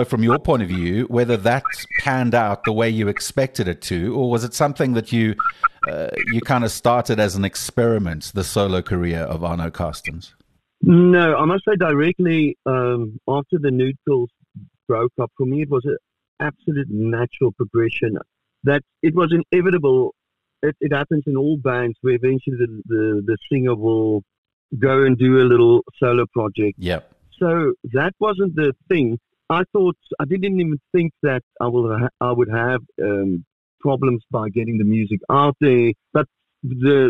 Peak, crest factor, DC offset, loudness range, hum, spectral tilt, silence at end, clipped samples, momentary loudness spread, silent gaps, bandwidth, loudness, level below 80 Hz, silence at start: -2 dBFS; 16 dB; 0.2%; 5 LU; none; -6.5 dB/octave; 0 s; under 0.1%; 9 LU; 16.28-16.37 s, 24.38-24.44 s, 24.53-24.69 s, 31.43-31.51 s, 33.47-33.78 s; 13 kHz; -19 LUFS; -48 dBFS; 0 s